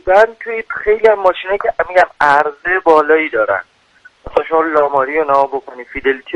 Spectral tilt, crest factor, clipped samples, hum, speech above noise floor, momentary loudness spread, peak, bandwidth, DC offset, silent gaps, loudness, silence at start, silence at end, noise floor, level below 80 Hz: -5 dB/octave; 14 dB; under 0.1%; none; 34 dB; 8 LU; 0 dBFS; 9.6 kHz; under 0.1%; none; -14 LUFS; 0.05 s; 0 s; -47 dBFS; -44 dBFS